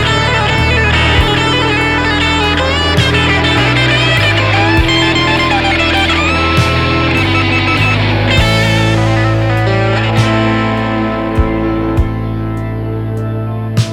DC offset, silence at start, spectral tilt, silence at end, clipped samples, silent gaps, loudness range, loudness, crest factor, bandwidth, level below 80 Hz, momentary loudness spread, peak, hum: under 0.1%; 0 s; -5.5 dB/octave; 0 s; under 0.1%; none; 4 LU; -11 LUFS; 12 dB; 13 kHz; -22 dBFS; 7 LU; 0 dBFS; none